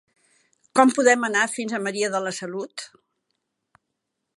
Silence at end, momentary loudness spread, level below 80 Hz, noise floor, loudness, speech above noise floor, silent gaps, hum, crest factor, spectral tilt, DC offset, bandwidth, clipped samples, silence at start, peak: 1.5 s; 17 LU; -78 dBFS; -80 dBFS; -22 LUFS; 58 dB; none; none; 22 dB; -3 dB/octave; under 0.1%; 11.5 kHz; under 0.1%; 0.75 s; -2 dBFS